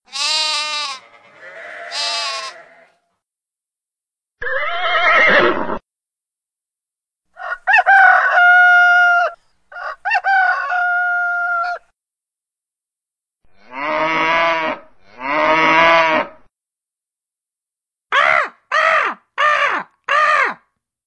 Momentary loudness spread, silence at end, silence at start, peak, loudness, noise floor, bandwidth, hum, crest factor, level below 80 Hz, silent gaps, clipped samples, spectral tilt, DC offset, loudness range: 18 LU; 0.5 s; 0.15 s; 0 dBFS; -14 LUFS; -88 dBFS; 10.5 kHz; none; 18 dB; -54 dBFS; none; under 0.1%; -2 dB/octave; under 0.1%; 11 LU